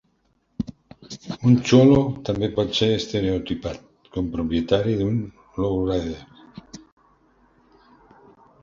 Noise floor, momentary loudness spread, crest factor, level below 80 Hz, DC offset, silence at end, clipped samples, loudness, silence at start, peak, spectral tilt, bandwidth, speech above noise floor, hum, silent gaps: -67 dBFS; 19 LU; 20 dB; -44 dBFS; under 0.1%; 1.85 s; under 0.1%; -22 LUFS; 0.6 s; -2 dBFS; -7 dB/octave; 7.4 kHz; 46 dB; none; none